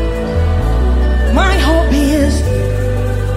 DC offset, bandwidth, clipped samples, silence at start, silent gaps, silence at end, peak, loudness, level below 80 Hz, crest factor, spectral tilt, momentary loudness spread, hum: under 0.1%; 14.5 kHz; under 0.1%; 0 s; none; 0 s; 0 dBFS; -14 LUFS; -14 dBFS; 12 dB; -6.5 dB/octave; 5 LU; none